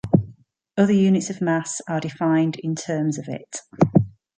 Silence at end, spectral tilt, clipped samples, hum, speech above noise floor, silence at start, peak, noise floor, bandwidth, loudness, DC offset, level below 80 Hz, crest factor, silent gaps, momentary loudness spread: 0.3 s; -6.5 dB/octave; under 0.1%; none; 27 dB; 0.05 s; -2 dBFS; -49 dBFS; 9.4 kHz; -22 LUFS; under 0.1%; -54 dBFS; 20 dB; none; 13 LU